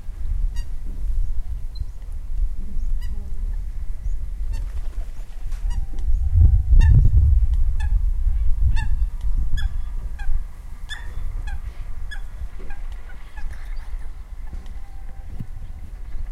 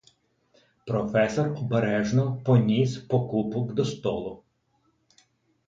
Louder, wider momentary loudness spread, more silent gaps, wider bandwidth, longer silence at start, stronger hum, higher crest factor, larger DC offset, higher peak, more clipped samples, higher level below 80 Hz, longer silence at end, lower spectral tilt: about the same, -25 LUFS vs -26 LUFS; first, 20 LU vs 8 LU; neither; second, 6.8 kHz vs 7.6 kHz; second, 0 s vs 0.85 s; neither; about the same, 16 dB vs 20 dB; neither; first, -4 dBFS vs -8 dBFS; neither; first, -22 dBFS vs -58 dBFS; second, 0 s vs 1.3 s; about the same, -7 dB/octave vs -7.5 dB/octave